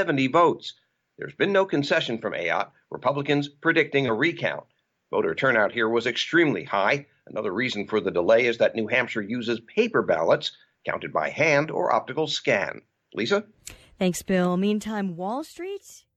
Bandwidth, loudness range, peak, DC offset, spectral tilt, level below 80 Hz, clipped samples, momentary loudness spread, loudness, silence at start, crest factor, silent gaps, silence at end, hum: 14 kHz; 3 LU; -8 dBFS; under 0.1%; -5 dB/octave; -64 dBFS; under 0.1%; 13 LU; -24 LUFS; 0 s; 16 dB; none; 0.2 s; none